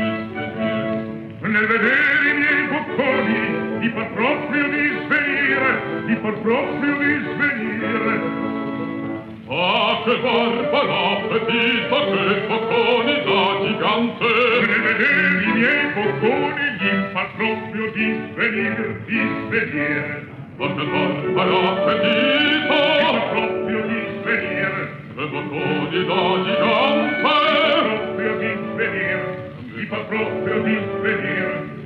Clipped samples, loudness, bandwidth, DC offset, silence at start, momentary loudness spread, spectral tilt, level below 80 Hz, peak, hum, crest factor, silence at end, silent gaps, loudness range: under 0.1%; -19 LUFS; 6.2 kHz; under 0.1%; 0 s; 9 LU; -7 dB/octave; -58 dBFS; -6 dBFS; none; 14 dB; 0 s; none; 5 LU